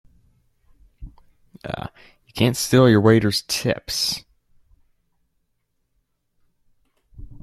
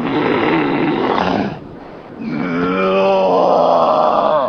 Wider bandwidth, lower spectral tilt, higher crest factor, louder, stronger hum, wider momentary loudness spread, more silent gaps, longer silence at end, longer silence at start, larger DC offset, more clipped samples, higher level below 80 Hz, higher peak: first, 14.5 kHz vs 6.6 kHz; second, -5 dB/octave vs -7 dB/octave; first, 22 dB vs 14 dB; second, -19 LUFS vs -15 LUFS; neither; first, 20 LU vs 16 LU; neither; about the same, 0.05 s vs 0 s; first, 1 s vs 0 s; neither; neither; about the same, -50 dBFS vs -48 dBFS; about the same, -2 dBFS vs 0 dBFS